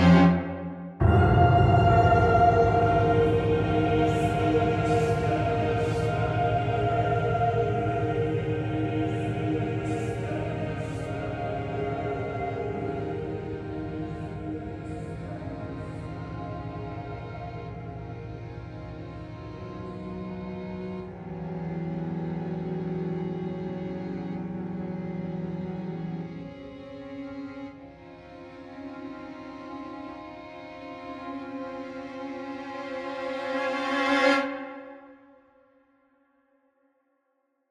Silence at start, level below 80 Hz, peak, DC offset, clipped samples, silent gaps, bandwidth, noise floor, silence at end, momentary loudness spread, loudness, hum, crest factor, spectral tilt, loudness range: 0 s; -44 dBFS; -8 dBFS; under 0.1%; under 0.1%; none; 10.5 kHz; -75 dBFS; 2.55 s; 18 LU; -27 LUFS; none; 20 dB; -8 dB/octave; 17 LU